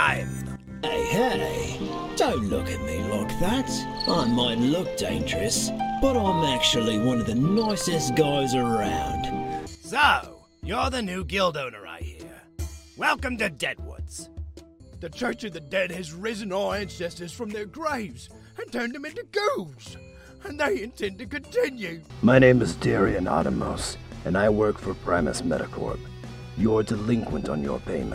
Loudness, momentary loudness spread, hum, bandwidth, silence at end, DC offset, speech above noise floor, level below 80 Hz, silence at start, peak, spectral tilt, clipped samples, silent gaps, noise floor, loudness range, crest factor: -25 LUFS; 16 LU; none; 16 kHz; 0 s; under 0.1%; 21 dB; -42 dBFS; 0 s; -2 dBFS; -4.5 dB/octave; under 0.1%; none; -46 dBFS; 8 LU; 22 dB